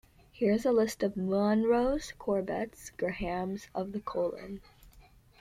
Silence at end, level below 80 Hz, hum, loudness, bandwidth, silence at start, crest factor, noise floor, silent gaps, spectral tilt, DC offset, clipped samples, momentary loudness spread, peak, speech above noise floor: 0.4 s; -54 dBFS; none; -31 LUFS; 15.5 kHz; 0.35 s; 16 dB; -58 dBFS; none; -6 dB/octave; under 0.1%; under 0.1%; 11 LU; -16 dBFS; 28 dB